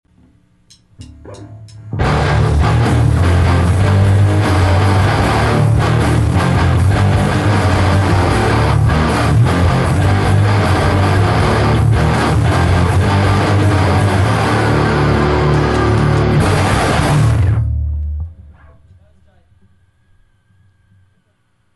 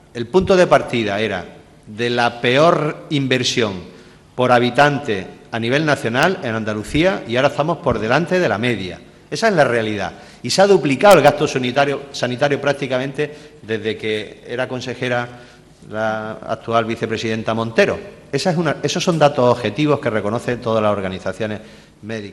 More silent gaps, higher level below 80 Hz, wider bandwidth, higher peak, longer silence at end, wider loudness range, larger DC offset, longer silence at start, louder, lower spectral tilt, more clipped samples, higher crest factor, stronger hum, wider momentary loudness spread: neither; first, -24 dBFS vs -48 dBFS; about the same, 12 kHz vs 12.5 kHz; about the same, 0 dBFS vs 0 dBFS; first, 3.45 s vs 0 s; second, 4 LU vs 7 LU; neither; first, 1 s vs 0.15 s; first, -13 LUFS vs -18 LUFS; first, -6.5 dB/octave vs -5 dB/octave; neither; second, 12 dB vs 18 dB; neither; second, 1 LU vs 13 LU